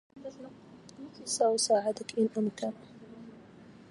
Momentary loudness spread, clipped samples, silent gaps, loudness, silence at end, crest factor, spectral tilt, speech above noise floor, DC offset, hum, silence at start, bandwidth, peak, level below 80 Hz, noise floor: 24 LU; under 0.1%; none; -30 LUFS; 0.2 s; 18 dB; -3.5 dB/octave; 22 dB; under 0.1%; none; 0.15 s; 11.5 kHz; -14 dBFS; -74 dBFS; -53 dBFS